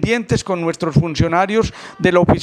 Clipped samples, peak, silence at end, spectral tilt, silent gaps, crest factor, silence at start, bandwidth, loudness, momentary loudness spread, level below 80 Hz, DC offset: under 0.1%; 0 dBFS; 0 s; -6.5 dB/octave; none; 16 dB; 0 s; 11 kHz; -17 LUFS; 5 LU; -36 dBFS; under 0.1%